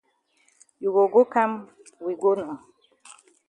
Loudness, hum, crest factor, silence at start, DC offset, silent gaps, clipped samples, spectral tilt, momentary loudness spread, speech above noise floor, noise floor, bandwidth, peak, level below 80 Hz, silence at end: -23 LUFS; none; 20 dB; 0.8 s; under 0.1%; none; under 0.1%; -6.5 dB/octave; 17 LU; 43 dB; -66 dBFS; 10 kHz; -6 dBFS; -76 dBFS; 0.9 s